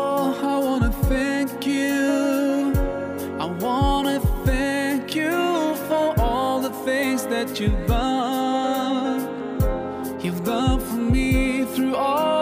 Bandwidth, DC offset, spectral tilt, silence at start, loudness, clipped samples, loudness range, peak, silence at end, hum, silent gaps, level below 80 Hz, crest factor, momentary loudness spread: 16 kHz; under 0.1%; -6 dB/octave; 0 s; -22 LUFS; under 0.1%; 2 LU; -8 dBFS; 0 s; none; none; -30 dBFS; 14 dB; 5 LU